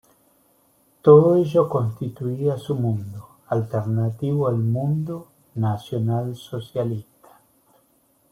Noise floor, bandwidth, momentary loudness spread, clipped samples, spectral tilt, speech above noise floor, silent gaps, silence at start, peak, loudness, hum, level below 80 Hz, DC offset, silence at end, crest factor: -62 dBFS; 15 kHz; 17 LU; under 0.1%; -9.5 dB/octave; 42 dB; none; 1.05 s; -2 dBFS; -22 LUFS; none; -60 dBFS; under 0.1%; 1.3 s; 20 dB